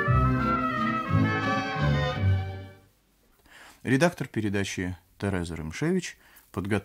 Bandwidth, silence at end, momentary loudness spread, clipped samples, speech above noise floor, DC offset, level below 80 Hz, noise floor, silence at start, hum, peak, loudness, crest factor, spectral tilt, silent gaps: 15.5 kHz; 0 s; 13 LU; under 0.1%; 36 dB; under 0.1%; -42 dBFS; -64 dBFS; 0 s; none; -10 dBFS; -27 LUFS; 18 dB; -6.5 dB/octave; none